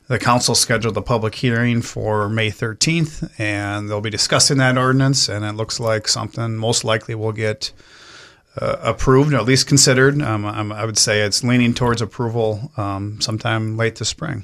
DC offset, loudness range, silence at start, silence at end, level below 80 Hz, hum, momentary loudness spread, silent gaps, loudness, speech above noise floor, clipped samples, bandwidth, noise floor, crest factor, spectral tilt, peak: under 0.1%; 5 LU; 0.1 s; 0 s; -42 dBFS; none; 10 LU; none; -18 LUFS; 26 dB; under 0.1%; 15 kHz; -44 dBFS; 18 dB; -4 dB/octave; 0 dBFS